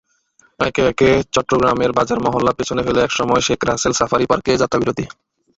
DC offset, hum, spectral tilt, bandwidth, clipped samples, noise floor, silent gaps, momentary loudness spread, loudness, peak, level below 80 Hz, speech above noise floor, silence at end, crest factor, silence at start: under 0.1%; none; -4.5 dB/octave; 8.2 kHz; under 0.1%; -57 dBFS; none; 5 LU; -17 LUFS; -2 dBFS; -42 dBFS; 40 dB; 0.5 s; 16 dB; 0.6 s